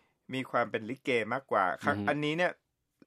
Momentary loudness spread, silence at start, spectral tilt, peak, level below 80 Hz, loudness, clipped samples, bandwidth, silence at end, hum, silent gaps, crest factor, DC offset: 6 LU; 0.3 s; -6 dB/octave; -14 dBFS; -78 dBFS; -31 LUFS; under 0.1%; 14 kHz; 0.55 s; none; none; 20 dB; under 0.1%